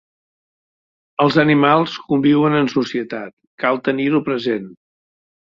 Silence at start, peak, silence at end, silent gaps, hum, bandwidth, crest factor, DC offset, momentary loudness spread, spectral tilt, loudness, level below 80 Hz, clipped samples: 1.2 s; -2 dBFS; 0.7 s; 3.33-3.37 s, 3.47-3.58 s; none; 7.2 kHz; 18 dB; under 0.1%; 13 LU; -7 dB/octave; -17 LUFS; -60 dBFS; under 0.1%